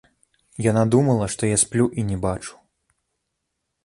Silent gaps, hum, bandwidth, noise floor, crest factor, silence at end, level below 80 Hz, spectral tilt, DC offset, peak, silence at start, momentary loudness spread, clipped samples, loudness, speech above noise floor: none; none; 11.5 kHz; -78 dBFS; 20 dB; 1.35 s; -46 dBFS; -5.5 dB/octave; under 0.1%; -4 dBFS; 0.6 s; 13 LU; under 0.1%; -21 LUFS; 58 dB